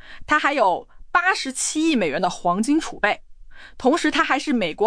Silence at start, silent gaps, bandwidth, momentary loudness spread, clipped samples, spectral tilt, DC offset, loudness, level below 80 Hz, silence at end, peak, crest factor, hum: 0 s; none; 10.5 kHz; 4 LU; under 0.1%; -3 dB/octave; under 0.1%; -21 LUFS; -48 dBFS; 0 s; -4 dBFS; 16 dB; none